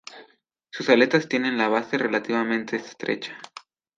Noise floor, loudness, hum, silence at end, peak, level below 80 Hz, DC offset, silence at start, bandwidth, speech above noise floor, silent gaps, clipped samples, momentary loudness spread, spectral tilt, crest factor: -61 dBFS; -23 LUFS; none; 0.5 s; -4 dBFS; -76 dBFS; under 0.1%; 0.1 s; 7.6 kHz; 38 dB; none; under 0.1%; 21 LU; -5 dB/octave; 20 dB